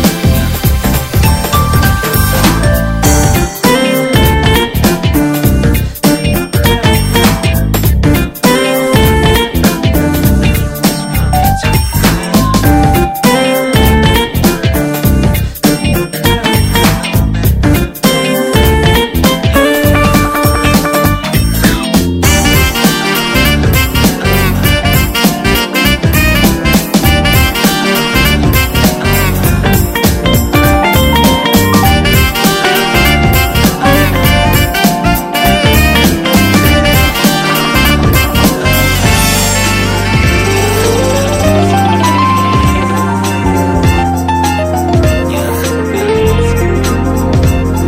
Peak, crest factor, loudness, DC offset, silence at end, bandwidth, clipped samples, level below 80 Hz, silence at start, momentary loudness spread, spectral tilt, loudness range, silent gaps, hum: 0 dBFS; 10 dB; -9 LUFS; under 0.1%; 0 s; over 20 kHz; 0.7%; -16 dBFS; 0 s; 4 LU; -4.5 dB/octave; 2 LU; none; none